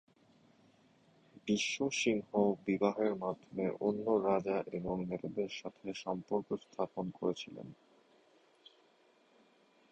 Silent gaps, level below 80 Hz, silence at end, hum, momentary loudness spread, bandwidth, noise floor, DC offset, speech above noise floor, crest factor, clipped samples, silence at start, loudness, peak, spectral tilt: none; -70 dBFS; 2.2 s; none; 11 LU; 9.4 kHz; -69 dBFS; under 0.1%; 33 dB; 22 dB; under 0.1%; 1.45 s; -36 LUFS; -16 dBFS; -5 dB/octave